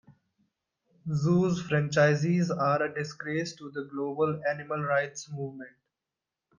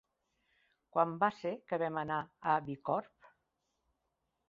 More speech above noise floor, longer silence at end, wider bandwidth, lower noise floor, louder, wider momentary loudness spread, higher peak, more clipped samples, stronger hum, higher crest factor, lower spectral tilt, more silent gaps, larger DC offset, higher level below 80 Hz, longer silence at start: first, 61 dB vs 49 dB; second, 0.9 s vs 1.45 s; about the same, 7.4 kHz vs 7.4 kHz; first, -89 dBFS vs -84 dBFS; first, -28 LUFS vs -35 LUFS; first, 14 LU vs 6 LU; first, -12 dBFS vs -16 dBFS; neither; neither; about the same, 18 dB vs 22 dB; first, -6.5 dB/octave vs -5 dB/octave; neither; neither; first, -68 dBFS vs -76 dBFS; second, 0.1 s vs 0.95 s